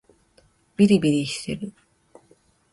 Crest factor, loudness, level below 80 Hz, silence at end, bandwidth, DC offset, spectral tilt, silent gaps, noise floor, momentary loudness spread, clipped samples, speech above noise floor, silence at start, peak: 18 dB; -22 LUFS; -58 dBFS; 1.05 s; 11.5 kHz; under 0.1%; -6 dB/octave; none; -60 dBFS; 19 LU; under 0.1%; 40 dB; 0.8 s; -6 dBFS